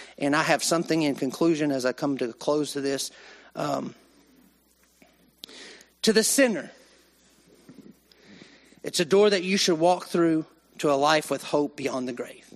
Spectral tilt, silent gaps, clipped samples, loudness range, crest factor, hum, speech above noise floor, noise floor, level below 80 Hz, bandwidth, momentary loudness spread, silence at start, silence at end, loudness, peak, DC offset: -3.5 dB/octave; none; under 0.1%; 8 LU; 22 dB; none; 38 dB; -63 dBFS; -70 dBFS; 13.5 kHz; 19 LU; 0 s; 0.25 s; -25 LUFS; -6 dBFS; under 0.1%